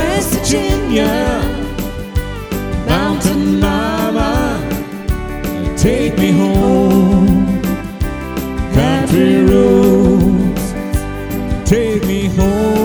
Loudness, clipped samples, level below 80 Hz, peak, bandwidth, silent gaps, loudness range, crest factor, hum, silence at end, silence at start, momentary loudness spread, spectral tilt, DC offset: -14 LUFS; under 0.1%; -24 dBFS; 0 dBFS; over 20 kHz; none; 4 LU; 12 dB; none; 0 s; 0 s; 11 LU; -6 dB/octave; under 0.1%